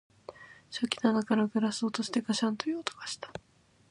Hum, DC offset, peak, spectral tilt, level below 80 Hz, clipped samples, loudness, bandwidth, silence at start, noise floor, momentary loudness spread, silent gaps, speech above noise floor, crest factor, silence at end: none; under 0.1%; -10 dBFS; -4.5 dB/octave; -72 dBFS; under 0.1%; -31 LUFS; 11.5 kHz; 0.3 s; -50 dBFS; 19 LU; none; 20 dB; 22 dB; 0.5 s